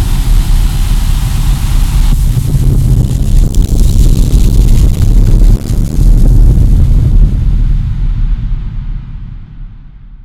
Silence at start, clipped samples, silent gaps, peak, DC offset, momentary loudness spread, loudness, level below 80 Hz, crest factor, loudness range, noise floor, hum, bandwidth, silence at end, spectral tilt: 0 s; 3%; none; 0 dBFS; under 0.1%; 12 LU; -11 LUFS; -8 dBFS; 8 dB; 3 LU; -29 dBFS; none; 13.5 kHz; 0 s; -6.5 dB/octave